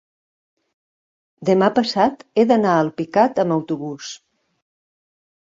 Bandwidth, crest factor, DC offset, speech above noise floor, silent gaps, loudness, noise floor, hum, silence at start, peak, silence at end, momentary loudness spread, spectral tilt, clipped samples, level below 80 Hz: 7.8 kHz; 18 dB; under 0.1%; over 72 dB; none; -18 LUFS; under -90 dBFS; none; 1.4 s; -2 dBFS; 1.4 s; 14 LU; -6 dB/octave; under 0.1%; -64 dBFS